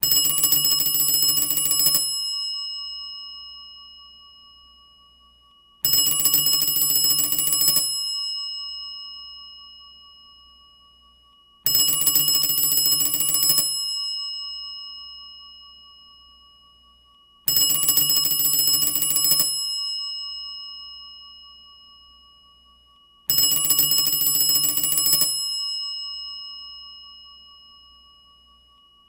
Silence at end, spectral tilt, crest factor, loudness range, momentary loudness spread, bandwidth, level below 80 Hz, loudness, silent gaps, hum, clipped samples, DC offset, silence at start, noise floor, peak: 1.75 s; 0.5 dB/octave; 22 dB; 14 LU; 20 LU; 17.5 kHz; -60 dBFS; -18 LUFS; none; 60 Hz at -65 dBFS; under 0.1%; under 0.1%; 0 s; -56 dBFS; -2 dBFS